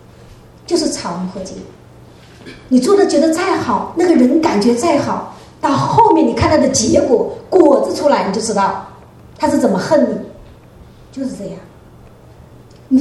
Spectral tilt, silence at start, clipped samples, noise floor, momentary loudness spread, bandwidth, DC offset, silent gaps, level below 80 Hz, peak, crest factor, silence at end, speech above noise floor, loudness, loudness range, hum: -5 dB/octave; 0.7 s; under 0.1%; -40 dBFS; 16 LU; 12.5 kHz; under 0.1%; none; -44 dBFS; 0 dBFS; 16 dB; 0 s; 27 dB; -14 LUFS; 7 LU; none